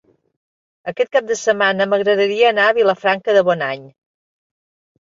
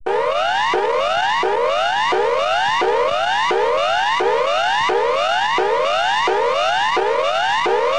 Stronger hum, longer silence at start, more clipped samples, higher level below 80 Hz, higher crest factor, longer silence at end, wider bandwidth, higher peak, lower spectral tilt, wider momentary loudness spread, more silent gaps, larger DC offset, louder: neither; first, 0.85 s vs 0.05 s; neither; second, -66 dBFS vs -52 dBFS; about the same, 16 dB vs 12 dB; first, 1.2 s vs 0 s; second, 7.8 kHz vs 10 kHz; first, -2 dBFS vs -6 dBFS; first, -3.5 dB/octave vs -2 dB/octave; first, 10 LU vs 1 LU; neither; second, under 0.1% vs 1%; about the same, -16 LUFS vs -17 LUFS